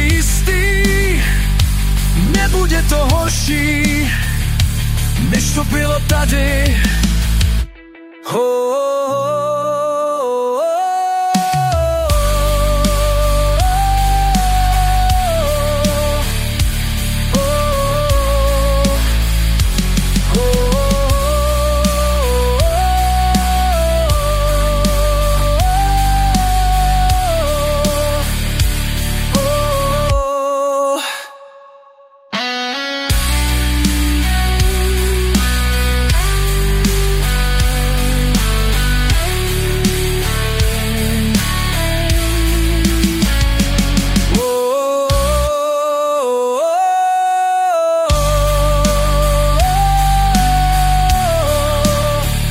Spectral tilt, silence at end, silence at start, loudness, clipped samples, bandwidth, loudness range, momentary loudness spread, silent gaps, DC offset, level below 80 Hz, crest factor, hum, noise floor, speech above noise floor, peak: -4.5 dB/octave; 0 s; 0 s; -15 LUFS; under 0.1%; 16 kHz; 3 LU; 3 LU; none; under 0.1%; -16 dBFS; 14 dB; none; -44 dBFS; 31 dB; 0 dBFS